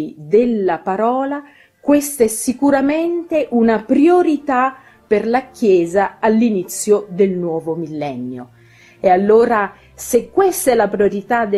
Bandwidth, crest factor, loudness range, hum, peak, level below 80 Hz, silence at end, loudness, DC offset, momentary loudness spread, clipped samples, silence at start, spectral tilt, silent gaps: 14.5 kHz; 14 dB; 2 LU; none; 0 dBFS; -52 dBFS; 0 s; -16 LUFS; under 0.1%; 11 LU; under 0.1%; 0 s; -5.5 dB/octave; none